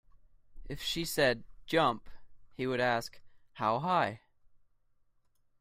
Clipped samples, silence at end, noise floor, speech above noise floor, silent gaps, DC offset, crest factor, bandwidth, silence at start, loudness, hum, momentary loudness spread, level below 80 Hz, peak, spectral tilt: under 0.1%; 1.45 s; -70 dBFS; 39 dB; none; under 0.1%; 20 dB; 16 kHz; 0.5 s; -32 LUFS; none; 13 LU; -56 dBFS; -14 dBFS; -4 dB/octave